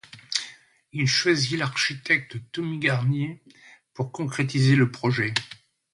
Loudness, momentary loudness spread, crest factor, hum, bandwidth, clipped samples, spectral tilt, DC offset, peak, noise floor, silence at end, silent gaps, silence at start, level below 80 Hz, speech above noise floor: -24 LUFS; 13 LU; 20 dB; none; 11.5 kHz; under 0.1%; -4.5 dB/octave; under 0.1%; -6 dBFS; -46 dBFS; 0.4 s; none; 0.15 s; -62 dBFS; 22 dB